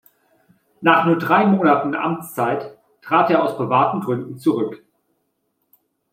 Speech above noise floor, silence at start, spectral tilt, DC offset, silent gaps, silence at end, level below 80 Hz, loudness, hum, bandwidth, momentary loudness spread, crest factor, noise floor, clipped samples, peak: 53 dB; 0.8 s; -7 dB/octave; under 0.1%; none; 1.35 s; -68 dBFS; -18 LUFS; none; 16 kHz; 9 LU; 18 dB; -71 dBFS; under 0.1%; -2 dBFS